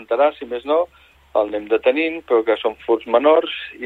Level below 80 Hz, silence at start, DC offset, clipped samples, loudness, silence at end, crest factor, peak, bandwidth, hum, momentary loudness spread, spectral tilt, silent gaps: -58 dBFS; 0 s; under 0.1%; under 0.1%; -19 LUFS; 0 s; 16 dB; -2 dBFS; 4.5 kHz; none; 8 LU; -5.5 dB/octave; none